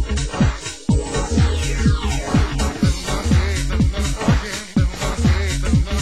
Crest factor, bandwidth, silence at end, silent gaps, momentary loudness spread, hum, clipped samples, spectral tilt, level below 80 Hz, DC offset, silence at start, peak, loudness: 14 dB; 12.5 kHz; 0 s; none; 3 LU; none; under 0.1%; -5.5 dB/octave; -22 dBFS; 0.8%; 0 s; -4 dBFS; -20 LUFS